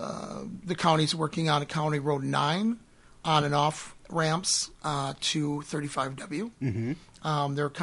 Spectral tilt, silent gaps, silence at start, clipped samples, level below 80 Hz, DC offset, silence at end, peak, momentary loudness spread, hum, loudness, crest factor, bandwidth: -4.5 dB/octave; none; 0 s; under 0.1%; -60 dBFS; under 0.1%; 0 s; -8 dBFS; 11 LU; none; -29 LUFS; 20 dB; 11.5 kHz